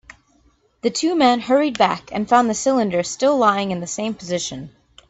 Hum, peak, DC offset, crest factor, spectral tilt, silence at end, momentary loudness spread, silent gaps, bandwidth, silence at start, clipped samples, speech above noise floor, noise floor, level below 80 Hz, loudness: none; -2 dBFS; under 0.1%; 18 dB; -4 dB/octave; 0.4 s; 9 LU; none; 8.4 kHz; 0.85 s; under 0.1%; 40 dB; -59 dBFS; -56 dBFS; -19 LUFS